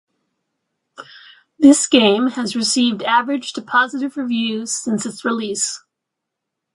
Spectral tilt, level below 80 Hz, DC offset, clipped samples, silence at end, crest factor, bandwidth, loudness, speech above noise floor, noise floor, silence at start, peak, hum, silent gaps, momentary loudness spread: -2.5 dB/octave; -66 dBFS; under 0.1%; under 0.1%; 0.95 s; 18 dB; 11.5 kHz; -17 LUFS; 63 dB; -80 dBFS; 1 s; 0 dBFS; none; none; 10 LU